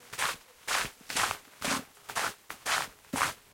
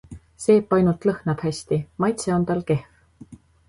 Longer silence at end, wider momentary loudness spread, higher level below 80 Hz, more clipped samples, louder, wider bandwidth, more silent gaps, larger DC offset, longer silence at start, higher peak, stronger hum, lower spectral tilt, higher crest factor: second, 0.15 s vs 0.35 s; about the same, 6 LU vs 8 LU; second, -62 dBFS vs -52 dBFS; neither; second, -33 LUFS vs -22 LUFS; first, 17 kHz vs 11.5 kHz; neither; neither; about the same, 0 s vs 0.1 s; second, -10 dBFS vs -6 dBFS; neither; second, -1 dB/octave vs -7 dB/octave; first, 24 dB vs 18 dB